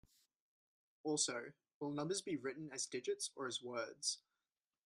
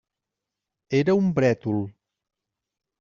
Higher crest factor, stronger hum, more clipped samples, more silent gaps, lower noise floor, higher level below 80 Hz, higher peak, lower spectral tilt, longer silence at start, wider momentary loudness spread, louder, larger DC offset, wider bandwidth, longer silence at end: first, 24 dB vs 18 dB; neither; neither; first, 1.74-1.81 s vs none; first, under -90 dBFS vs -86 dBFS; second, -86 dBFS vs -62 dBFS; second, -22 dBFS vs -8 dBFS; second, -2.5 dB/octave vs -7 dB/octave; first, 1.05 s vs 0.9 s; about the same, 11 LU vs 9 LU; second, -43 LUFS vs -23 LUFS; neither; first, 13 kHz vs 7.4 kHz; second, 0.65 s vs 1.1 s